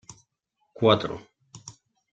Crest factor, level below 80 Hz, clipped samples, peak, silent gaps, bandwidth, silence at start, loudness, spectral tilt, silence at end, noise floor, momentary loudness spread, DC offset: 24 dB; -62 dBFS; under 0.1%; -6 dBFS; none; 8.8 kHz; 0.1 s; -24 LUFS; -5.5 dB/octave; 0.4 s; -76 dBFS; 24 LU; under 0.1%